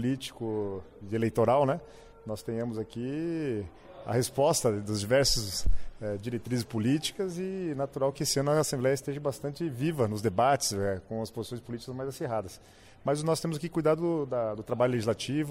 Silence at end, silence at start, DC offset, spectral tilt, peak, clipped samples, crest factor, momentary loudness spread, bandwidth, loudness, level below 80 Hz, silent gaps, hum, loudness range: 0 s; 0 s; under 0.1%; -5 dB/octave; -14 dBFS; under 0.1%; 14 dB; 12 LU; 16 kHz; -30 LUFS; -46 dBFS; none; none; 3 LU